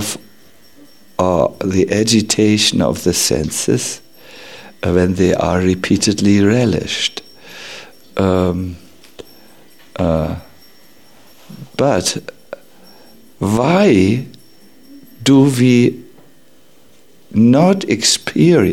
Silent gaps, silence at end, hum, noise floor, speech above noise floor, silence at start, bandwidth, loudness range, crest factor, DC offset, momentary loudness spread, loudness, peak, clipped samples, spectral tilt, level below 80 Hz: none; 0 s; none; -50 dBFS; 37 dB; 0 s; 16.5 kHz; 7 LU; 16 dB; 0.7%; 21 LU; -14 LUFS; 0 dBFS; under 0.1%; -5 dB/octave; -42 dBFS